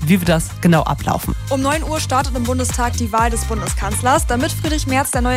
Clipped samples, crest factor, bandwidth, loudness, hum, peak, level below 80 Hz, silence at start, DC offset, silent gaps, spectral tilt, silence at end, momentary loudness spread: under 0.1%; 14 dB; 16 kHz; -18 LUFS; none; -4 dBFS; -26 dBFS; 0 s; under 0.1%; none; -5 dB/octave; 0 s; 6 LU